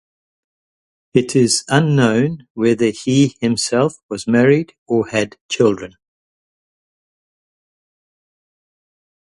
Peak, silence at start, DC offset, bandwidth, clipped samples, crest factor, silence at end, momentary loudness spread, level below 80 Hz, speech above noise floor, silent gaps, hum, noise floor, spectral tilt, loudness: 0 dBFS; 1.15 s; under 0.1%; 11.5 kHz; under 0.1%; 18 dB; 3.5 s; 7 LU; -56 dBFS; over 74 dB; 2.50-2.55 s, 4.03-4.09 s, 4.78-4.86 s, 5.41-5.49 s; none; under -90 dBFS; -5 dB/octave; -16 LUFS